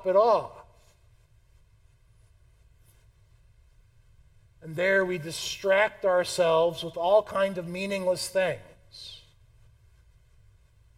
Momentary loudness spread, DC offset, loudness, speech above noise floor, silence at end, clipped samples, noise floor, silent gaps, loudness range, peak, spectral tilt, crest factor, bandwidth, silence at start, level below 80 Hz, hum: 20 LU; under 0.1%; -26 LUFS; 34 dB; 1.8 s; under 0.1%; -60 dBFS; none; 8 LU; -10 dBFS; -4 dB/octave; 20 dB; 16 kHz; 0 s; -60 dBFS; none